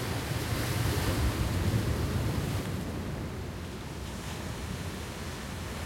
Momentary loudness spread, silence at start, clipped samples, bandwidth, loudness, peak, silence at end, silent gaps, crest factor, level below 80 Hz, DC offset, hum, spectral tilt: 9 LU; 0 s; under 0.1%; 16.5 kHz; -33 LUFS; -16 dBFS; 0 s; none; 16 dB; -40 dBFS; under 0.1%; none; -5.5 dB/octave